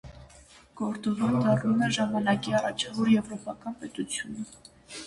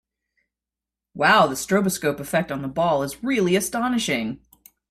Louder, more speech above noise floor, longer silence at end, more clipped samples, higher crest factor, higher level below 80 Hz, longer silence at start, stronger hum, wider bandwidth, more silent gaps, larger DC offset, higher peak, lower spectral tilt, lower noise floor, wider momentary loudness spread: second, -28 LUFS vs -22 LUFS; second, 27 dB vs 67 dB; second, 0 s vs 0.55 s; neither; about the same, 16 dB vs 18 dB; about the same, -60 dBFS vs -56 dBFS; second, 0.05 s vs 1.15 s; neither; second, 11.5 kHz vs 16 kHz; neither; neither; second, -12 dBFS vs -4 dBFS; about the same, -5 dB/octave vs -4 dB/octave; second, -54 dBFS vs -88 dBFS; first, 13 LU vs 8 LU